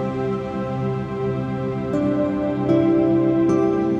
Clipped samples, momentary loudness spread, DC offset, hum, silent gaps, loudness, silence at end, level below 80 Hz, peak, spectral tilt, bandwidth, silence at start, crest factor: under 0.1%; 8 LU; under 0.1%; none; none; -21 LUFS; 0 s; -48 dBFS; -6 dBFS; -9 dB/octave; 7.4 kHz; 0 s; 14 dB